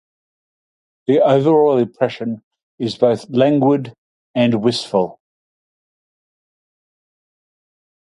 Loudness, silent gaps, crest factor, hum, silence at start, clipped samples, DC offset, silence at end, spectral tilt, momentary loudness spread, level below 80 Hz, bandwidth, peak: -17 LUFS; 2.43-2.51 s, 2.63-2.78 s, 3.98-4.34 s; 18 dB; none; 1.1 s; under 0.1%; under 0.1%; 2.95 s; -7 dB/octave; 13 LU; -64 dBFS; 11.5 kHz; 0 dBFS